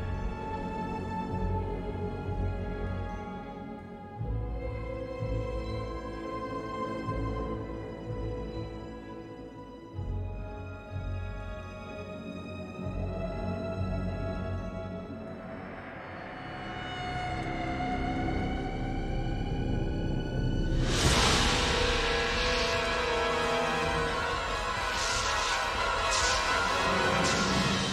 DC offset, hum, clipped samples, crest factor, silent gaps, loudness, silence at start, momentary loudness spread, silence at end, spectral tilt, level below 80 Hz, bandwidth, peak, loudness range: under 0.1%; none; under 0.1%; 22 dB; none; -31 LUFS; 0 s; 15 LU; 0 s; -4 dB/octave; -40 dBFS; 14.5 kHz; -10 dBFS; 12 LU